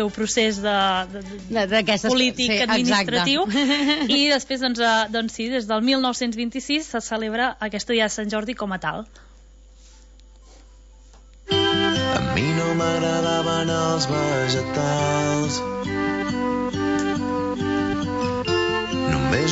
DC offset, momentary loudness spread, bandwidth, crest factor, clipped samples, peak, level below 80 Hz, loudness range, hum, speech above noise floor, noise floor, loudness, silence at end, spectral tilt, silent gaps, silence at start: under 0.1%; 7 LU; 8 kHz; 14 dB; under 0.1%; -8 dBFS; -46 dBFS; 7 LU; none; 26 dB; -47 dBFS; -21 LUFS; 0 s; -4 dB/octave; none; 0 s